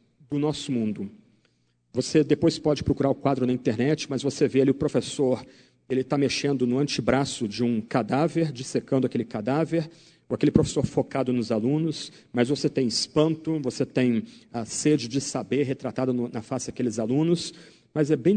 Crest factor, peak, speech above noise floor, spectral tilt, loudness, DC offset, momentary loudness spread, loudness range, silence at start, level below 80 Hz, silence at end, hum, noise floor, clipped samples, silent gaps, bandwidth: 22 dB; -4 dBFS; 43 dB; -5.5 dB/octave; -25 LUFS; under 0.1%; 8 LU; 2 LU; 0.3 s; -54 dBFS; 0 s; none; -68 dBFS; under 0.1%; none; 9.4 kHz